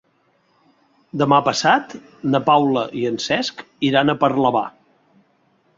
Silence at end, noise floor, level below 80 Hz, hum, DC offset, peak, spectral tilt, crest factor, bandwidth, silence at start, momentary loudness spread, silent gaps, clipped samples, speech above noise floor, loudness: 1.1 s; -62 dBFS; -62 dBFS; none; under 0.1%; -2 dBFS; -5 dB/octave; 18 dB; 7.8 kHz; 1.15 s; 11 LU; none; under 0.1%; 44 dB; -18 LUFS